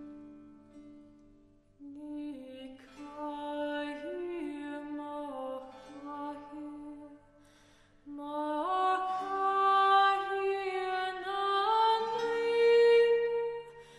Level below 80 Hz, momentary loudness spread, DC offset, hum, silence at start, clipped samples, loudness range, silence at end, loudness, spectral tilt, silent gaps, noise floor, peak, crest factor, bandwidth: -70 dBFS; 23 LU; under 0.1%; none; 0 s; under 0.1%; 16 LU; 0 s; -30 LUFS; -3.5 dB/octave; none; -62 dBFS; -14 dBFS; 18 dB; 11.5 kHz